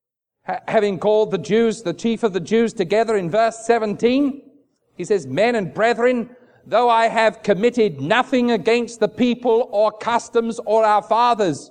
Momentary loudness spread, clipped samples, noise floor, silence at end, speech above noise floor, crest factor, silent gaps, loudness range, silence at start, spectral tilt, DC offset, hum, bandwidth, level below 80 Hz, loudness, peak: 6 LU; under 0.1%; -56 dBFS; 0.05 s; 38 dB; 16 dB; none; 2 LU; 0.5 s; -5 dB/octave; under 0.1%; none; 10 kHz; -60 dBFS; -19 LUFS; -2 dBFS